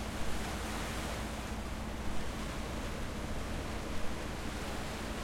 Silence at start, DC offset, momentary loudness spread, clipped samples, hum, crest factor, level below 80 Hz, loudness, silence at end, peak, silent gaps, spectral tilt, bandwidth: 0 s; under 0.1%; 2 LU; under 0.1%; none; 14 dB; -44 dBFS; -40 LUFS; 0 s; -22 dBFS; none; -4.5 dB/octave; 16.5 kHz